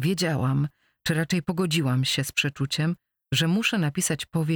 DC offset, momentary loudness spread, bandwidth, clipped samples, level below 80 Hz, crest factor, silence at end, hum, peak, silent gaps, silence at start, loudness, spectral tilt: under 0.1%; 5 LU; over 20 kHz; under 0.1%; -56 dBFS; 14 dB; 0 s; none; -10 dBFS; none; 0 s; -25 LUFS; -4.5 dB/octave